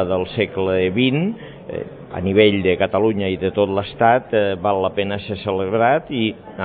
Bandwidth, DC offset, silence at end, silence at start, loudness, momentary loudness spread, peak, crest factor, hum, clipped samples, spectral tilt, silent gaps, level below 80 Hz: 4.7 kHz; under 0.1%; 0 s; 0 s; -19 LUFS; 10 LU; 0 dBFS; 18 dB; none; under 0.1%; -11 dB/octave; none; -50 dBFS